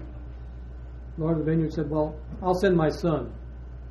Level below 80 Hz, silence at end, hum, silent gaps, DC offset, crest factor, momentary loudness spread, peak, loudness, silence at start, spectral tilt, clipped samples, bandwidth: -40 dBFS; 0 s; none; none; under 0.1%; 18 dB; 19 LU; -10 dBFS; -26 LUFS; 0 s; -8 dB/octave; under 0.1%; 12 kHz